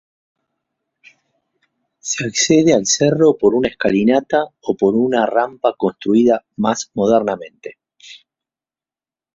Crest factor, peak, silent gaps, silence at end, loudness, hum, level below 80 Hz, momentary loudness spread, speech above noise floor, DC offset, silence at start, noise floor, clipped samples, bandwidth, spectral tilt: 18 dB; 0 dBFS; none; 1.2 s; -16 LUFS; none; -56 dBFS; 11 LU; over 74 dB; under 0.1%; 2.05 s; under -90 dBFS; under 0.1%; 7.8 kHz; -4.5 dB/octave